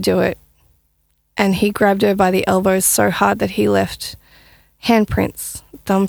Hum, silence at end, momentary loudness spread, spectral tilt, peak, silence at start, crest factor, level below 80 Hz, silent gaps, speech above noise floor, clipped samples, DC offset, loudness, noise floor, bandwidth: none; 0 s; 14 LU; -4.5 dB/octave; 0 dBFS; 0 s; 16 dB; -42 dBFS; none; 47 dB; under 0.1%; under 0.1%; -16 LUFS; -63 dBFS; over 20 kHz